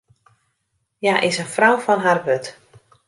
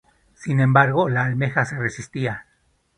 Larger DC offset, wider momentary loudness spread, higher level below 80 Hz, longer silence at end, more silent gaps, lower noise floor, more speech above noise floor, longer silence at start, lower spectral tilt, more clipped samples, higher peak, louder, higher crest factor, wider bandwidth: neither; second, 8 LU vs 12 LU; second, -68 dBFS vs -56 dBFS; about the same, 0.55 s vs 0.55 s; neither; first, -72 dBFS vs -64 dBFS; first, 54 dB vs 44 dB; first, 1 s vs 0.4 s; second, -4 dB/octave vs -7 dB/octave; neither; about the same, -2 dBFS vs 0 dBFS; first, -18 LUFS vs -21 LUFS; about the same, 18 dB vs 20 dB; first, 11.5 kHz vs 10 kHz